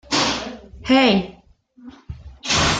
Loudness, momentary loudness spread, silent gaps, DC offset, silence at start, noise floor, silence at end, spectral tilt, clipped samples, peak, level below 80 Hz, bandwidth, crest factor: -18 LUFS; 24 LU; none; under 0.1%; 0.1 s; -50 dBFS; 0 s; -3.5 dB/octave; under 0.1%; -2 dBFS; -42 dBFS; 9.4 kHz; 18 dB